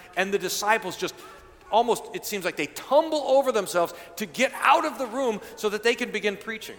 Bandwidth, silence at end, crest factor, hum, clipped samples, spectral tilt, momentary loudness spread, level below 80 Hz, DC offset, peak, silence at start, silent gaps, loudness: 19 kHz; 0 s; 20 dB; none; under 0.1%; -3 dB/octave; 10 LU; -64 dBFS; under 0.1%; -6 dBFS; 0 s; none; -25 LUFS